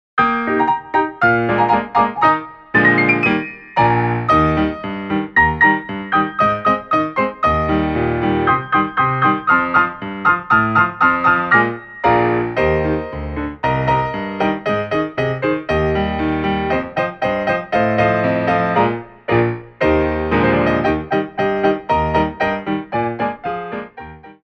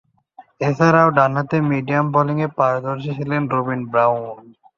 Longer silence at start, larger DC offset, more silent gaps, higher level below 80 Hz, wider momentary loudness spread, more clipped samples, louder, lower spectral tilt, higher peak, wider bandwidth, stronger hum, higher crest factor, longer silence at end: second, 0.15 s vs 0.4 s; neither; neither; first, -36 dBFS vs -58 dBFS; second, 8 LU vs 11 LU; neither; about the same, -17 LUFS vs -18 LUFS; about the same, -8 dB/octave vs -8 dB/octave; about the same, 0 dBFS vs -2 dBFS; about the same, 6.6 kHz vs 7.2 kHz; neither; about the same, 16 dB vs 18 dB; second, 0.1 s vs 0.25 s